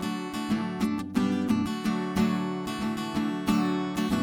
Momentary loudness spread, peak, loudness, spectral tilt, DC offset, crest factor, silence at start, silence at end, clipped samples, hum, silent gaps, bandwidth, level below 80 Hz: 5 LU; -14 dBFS; -28 LUFS; -6 dB/octave; under 0.1%; 14 dB; 0 s; 0 s; under 0.1%; none; none; 18 kHz; -54 dBFS